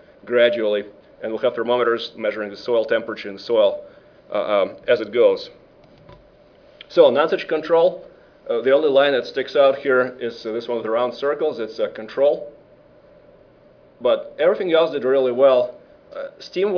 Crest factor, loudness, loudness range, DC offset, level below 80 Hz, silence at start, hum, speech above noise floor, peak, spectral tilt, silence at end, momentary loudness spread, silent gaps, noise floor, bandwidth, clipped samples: 20 dB; -20 LUFS; 5 LU; under 0.1%; -64 dBFS; 0.25 s; none; 32 dB; 0 dBFS; -6 dB/octave; 0 s; 13 LU; none; -51 dBFS; 5.4 kHz; under 0.1%